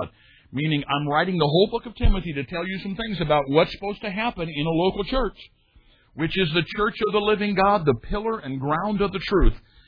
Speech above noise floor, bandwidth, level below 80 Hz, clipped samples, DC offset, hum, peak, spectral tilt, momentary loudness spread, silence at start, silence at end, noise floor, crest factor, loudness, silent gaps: 34 dB; 5.2 kHz; -30 dBFS; under 0.1%; under 0.1%; none; -4 dBFS; -8.5 dB/octave; 9 LU; 0 s; 0.3 s; -56 dBFS; 18 dB; -23 LUFS; none